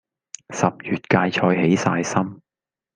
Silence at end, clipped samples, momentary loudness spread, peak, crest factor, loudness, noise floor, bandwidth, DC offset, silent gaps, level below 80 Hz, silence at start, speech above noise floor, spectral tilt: 0.6 s; under 0.1%; 14 LU; -2 dBFS; 20 dB; -21 LUFS; -90 dBFS; 9.6 kHz; under 0.1%; none; -60 dBFS; 0.5 s; 70 dB; -5.5 dB/octave